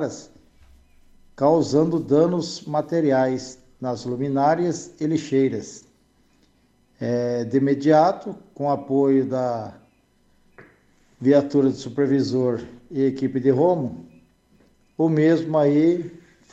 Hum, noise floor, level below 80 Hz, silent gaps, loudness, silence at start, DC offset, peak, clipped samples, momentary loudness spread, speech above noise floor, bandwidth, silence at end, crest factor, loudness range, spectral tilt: none; -61 dBFS; -60 dBFS; none; -21 LUFS; 0 s; under 0.1%; -4 dBFS; under 0.1%; 14 LU; 40 dB; 8.2 kHz; 0.35 s; 18 dB; 4 LU; -7 dB/octave